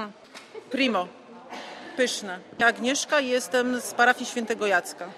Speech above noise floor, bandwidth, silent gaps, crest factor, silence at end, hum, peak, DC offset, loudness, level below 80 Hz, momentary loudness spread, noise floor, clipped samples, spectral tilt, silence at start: 20 dB; 14.5 kHz; none; 20 dB; 0 s; none; -6 dBFS; under 0.1%; -25 LUFS; -74 dBFS; 18 LU; -45 dBFS; under 0.1%; -2 dB/octave; 0 s